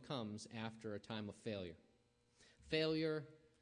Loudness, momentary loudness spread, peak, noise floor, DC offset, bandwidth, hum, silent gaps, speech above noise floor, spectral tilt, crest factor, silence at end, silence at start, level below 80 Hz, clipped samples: -45 LUFS; 13 LU; -28 dBFS; -77 dBFS; under 0.1%; 10 kHz; none; none; 32 dB; -5.5 dB/octave; 18 dB; 0.25 s; 0 s; -76 dBFS; under 0.1%